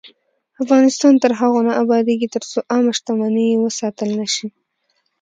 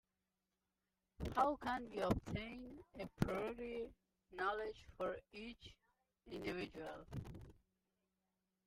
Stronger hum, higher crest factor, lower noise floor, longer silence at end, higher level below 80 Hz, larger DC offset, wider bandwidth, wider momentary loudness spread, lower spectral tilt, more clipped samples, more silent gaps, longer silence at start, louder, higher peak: neither; second, 16 dB vs 24 dB; second, -68 dBFS vs under -90 dBFS; second, 0.7 s vs 1.15 s; second, -68 dBFS vs -62 dBFS; neither; second, 9.2 kHz vs 16 kHz; second, 9 LU vs 17 LU; second, -4 dB/octave vs -6.5 dB/octave; neither; neither; second, 0.05 s vs 1.2 s; first, -17 LUFS vs -45 LUFS; first, 0 dBFS vs -22 dBFS